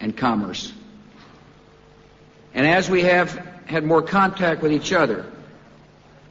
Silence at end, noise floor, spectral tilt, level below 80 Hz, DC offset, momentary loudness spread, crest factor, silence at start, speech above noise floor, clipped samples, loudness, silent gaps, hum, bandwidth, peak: 0.85 s; -50 dBFS; -5.5 dB/octave; -54 dBFS; under 0.1%; 14 LU; 16 dB; 0 s; 30 dB; under 0.1%; -20 LUFS; none; none; 8 kHz; -6 dBFS